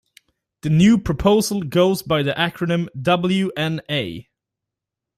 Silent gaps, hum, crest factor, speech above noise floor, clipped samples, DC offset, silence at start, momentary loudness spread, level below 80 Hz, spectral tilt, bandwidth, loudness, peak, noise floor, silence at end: none; none; 18 dB; 66 dB; under 0.1%; under 0.1%; 0.65 s; 9 LU; -44 dBFS; -6 dB/octave; 15.5 kHz; -19 LUFS; -2 dBFS; -85 dBFS; 0.95 s